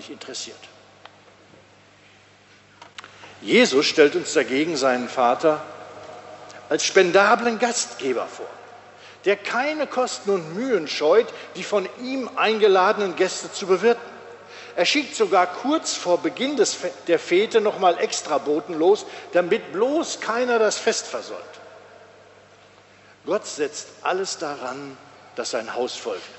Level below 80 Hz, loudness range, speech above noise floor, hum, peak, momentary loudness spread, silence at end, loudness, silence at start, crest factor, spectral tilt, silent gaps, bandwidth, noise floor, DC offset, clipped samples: -76 dBFS; 8 LU; 31 dB; 50 Hz at -60 dBFS; -2 dBFS; 20 LU; 0 s; -22 LUFS; 0 s; 20 dB; -3 dB/octave; none; 8.4 kHz; -52 dBFS; under 0.1%; under 0.1%